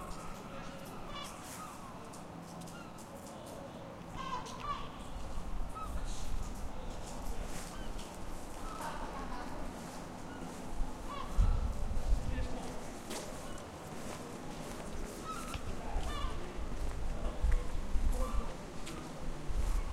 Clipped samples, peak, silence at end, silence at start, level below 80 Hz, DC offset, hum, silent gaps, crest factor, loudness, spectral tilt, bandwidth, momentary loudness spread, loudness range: under 0.1%; -18 dBFS; 0 s; 0 s; -40 dBFS; under 0.1%; none; none; 20 dB; -43 LUFS; -5 dB/octave; 15 kHz; 9 LU; 6 LU